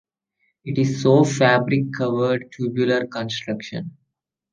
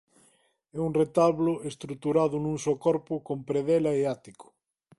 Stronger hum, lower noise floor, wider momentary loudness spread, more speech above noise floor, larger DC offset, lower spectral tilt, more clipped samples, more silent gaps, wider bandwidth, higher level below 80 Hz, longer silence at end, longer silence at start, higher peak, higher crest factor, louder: neither; first, -77 dBFS vs -66 dBFS; first, 14 LU vs 10 LU; first, 57 dB vs 39 dB; neither; about the same, -6 dB/octave vs -7 dB/octave; neither; neither; second, 9.6 kHz vs 11.5 kHz; about the same, -64 dBFS vs -62 dBFS; about the same, 0.65 s vs 0.55 s; about the same, 0.65 s vs 0.75 s; first, -2 dBFS vs -10 dBFS; about the same, 20 dB vs 18 dB; first, -20 LUFS vs -27 LUFS